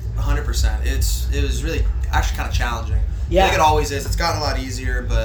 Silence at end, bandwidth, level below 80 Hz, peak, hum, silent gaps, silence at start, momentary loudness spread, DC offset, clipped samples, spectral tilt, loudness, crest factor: 0 s; over 20 kHz; -22 dBFS; -2 dBFS; none; none; 0 s; 7 LU; under 0.1%; under 0.1%; -4.5 dB/octave; -20 LUFS; 16 dB